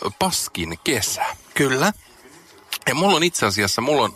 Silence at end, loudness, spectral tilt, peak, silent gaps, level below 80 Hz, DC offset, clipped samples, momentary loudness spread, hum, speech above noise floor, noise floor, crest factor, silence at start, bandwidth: 0 s; -20 LUFS; -3 dB/octave; -4 dBFS; none; -52 dBFS; under 0.1%; under 0.1%; 8 LU; none; 27 dB; -47 dBFS; 18 dB; 0 s; 16 kHz